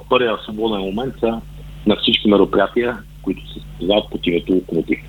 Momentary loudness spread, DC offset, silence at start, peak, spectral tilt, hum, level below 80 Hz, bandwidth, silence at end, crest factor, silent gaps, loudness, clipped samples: 13 LU; under 0.1%; 0 s; 0 dBFS; -7 dB/octave; none; -38 dBFS; 19.5 kHz; 0 s; 18 dB; none; -19 LUFS; under 0.1%